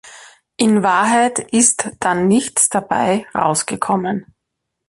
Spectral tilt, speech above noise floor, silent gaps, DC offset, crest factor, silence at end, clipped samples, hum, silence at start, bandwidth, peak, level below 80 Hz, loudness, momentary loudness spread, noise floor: -3.5 dB/octave; 61 dB; none; under 0.1%; 18 dB; 0.65 s; under 0.1%; none; 0.05 s; 12 kHz; 0 dBFS; -56 dBFS; -16 LUFS; 6 LU; -77 dBFS